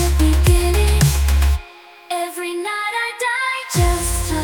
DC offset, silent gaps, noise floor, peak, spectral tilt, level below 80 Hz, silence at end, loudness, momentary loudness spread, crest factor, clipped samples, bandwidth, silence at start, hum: under 0.1%; none; -41 dBFS; -2 dBFS; -4.5 dB/octave; -20 dBFS; 0 s; -18 LUFS; 9 LU; 16 dB; under 0.1%; 19.5 kHz; 0 s; none